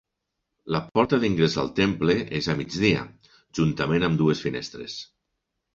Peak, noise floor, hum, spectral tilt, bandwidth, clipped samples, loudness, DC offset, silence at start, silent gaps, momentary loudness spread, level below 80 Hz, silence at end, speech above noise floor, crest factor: -6 dBFS; -81 dBFS; none; -6 dB/octave; 7.6 kHz; under 0.1%; -24 LUFS; under 0.1%; 0.65 s; none; 13 LU; -50 dBFS; 0.7 s; 57 dB; 20 dB